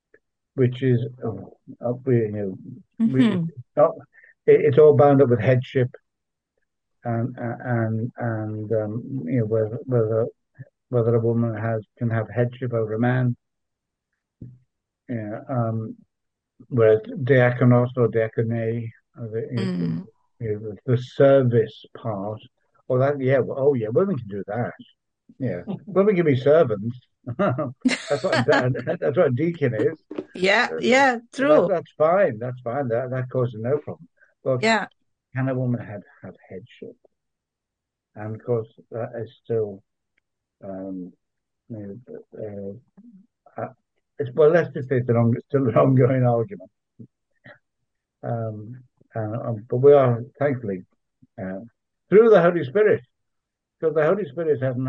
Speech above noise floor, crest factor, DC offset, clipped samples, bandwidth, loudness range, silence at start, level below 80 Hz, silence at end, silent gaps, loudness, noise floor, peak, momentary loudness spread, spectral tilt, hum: 63 dB; 20 dB; under 0.1%; under 0.1%; 9.4 kHz; 13 LU; 0.55 s; -66 dBFS; 0 s; none; -22 LUFS; -84 dBFS; -4 dBFS; 19 LU; -7.5 dB/octave; none